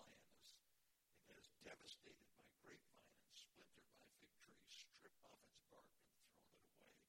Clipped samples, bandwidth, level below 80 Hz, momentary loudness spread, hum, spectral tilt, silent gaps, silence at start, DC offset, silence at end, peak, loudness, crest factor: under 0.1%; 16.5 kHz; under -90 dBFS; 8 LU; none; -2 dB/octave; none; 0 s; under 0.1%; 0 s; -48 dBFS; -65 LUFS; 24 dB